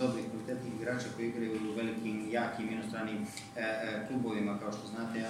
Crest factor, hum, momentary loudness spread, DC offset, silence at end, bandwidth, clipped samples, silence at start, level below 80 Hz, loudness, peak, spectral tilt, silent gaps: 18 dB; none; 5 LU; under 0.1%; 0 s; 15.5 kHz; under 0.1%; 0 s; -74 dBFS; -37 LUFS; -20 dBFS; -5.5 dB/octave; none